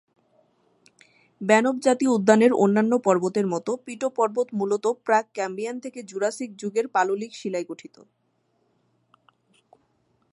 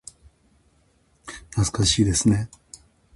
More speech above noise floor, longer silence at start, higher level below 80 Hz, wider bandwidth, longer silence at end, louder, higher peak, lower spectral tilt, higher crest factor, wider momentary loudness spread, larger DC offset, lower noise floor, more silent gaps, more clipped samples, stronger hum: first, 47 dB vs 42 dB; first, 1.4 s vs 1.25 s; second, -76 dBFS vs -40 dBFS; about the same, 11.5 kHz vs 11.5 kHz; first, 2.45 s vs 0.7 s; about the same, -23 LUFS vs -21 LUFS; first, -4 dBFS vs -8 dBFS; about the same, -5.5 dB/octave vs -4.5 dB/octave; about the same, 22 dB vs 18 dB; second, 13 LU vs 23 LU; neither; first, -70 dBFS vs -62 dBFS; neither; neither; neither